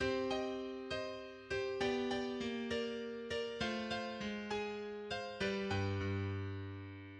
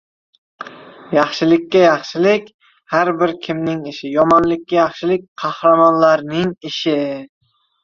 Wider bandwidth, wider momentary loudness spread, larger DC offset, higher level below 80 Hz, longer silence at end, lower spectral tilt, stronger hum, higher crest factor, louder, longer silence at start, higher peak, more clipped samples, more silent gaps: first, 9.8 kHz vs 7.2 kHz; second, 7 LU vs 13 LU; neither; second, -64 dBFS vs -56 dBFS; second, 0 s vs 0.55 s; about the same, -5.5 dB/octave vs -6 dB/octave; neither; about the same, 16 dB vs 14 dB; second, -40 LUFS vs -16 LUFS; second, 0 s vs 0.6 s; second, -24 dBFS vs -2 dBFS; neither; second, none vs 2.54-2.59 s, 5.28-5.36 s